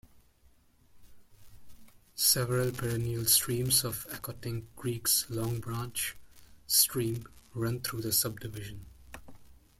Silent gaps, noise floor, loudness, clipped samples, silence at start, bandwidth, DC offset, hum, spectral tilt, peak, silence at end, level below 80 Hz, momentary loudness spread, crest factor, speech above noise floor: none; -63 dBFS; -29 LUFS; under 0.1%; 0.15 s; 16.5 kHz; under 0.1%; none; -3 dB/octave; -10 dBFS; 0.25 s; -56 dBFS; 19 LU; 24 dB; 32 dB